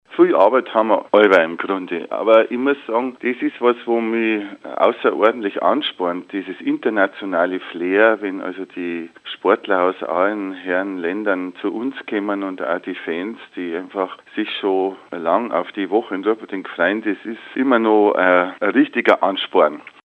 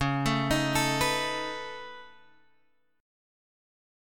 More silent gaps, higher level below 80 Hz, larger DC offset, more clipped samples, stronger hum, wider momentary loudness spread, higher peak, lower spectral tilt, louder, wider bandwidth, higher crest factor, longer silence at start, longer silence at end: neither; second, -76 dBFS vs -50 dBFS; neither; neither; neither; second, 12 LU vs 17 LU; first, 0 dBFS vs -12 dBFS; first, -6.5 dB/octave vs -4 dB/octave; first, -19 LUFS vs -28 LUFS; second, 7.8 kHz vs 17.5 kHz; about the same, 18 dB vs 20 dB; about the same, 0.1 s vs 0 s; second, 0.15 s vs 0.95 s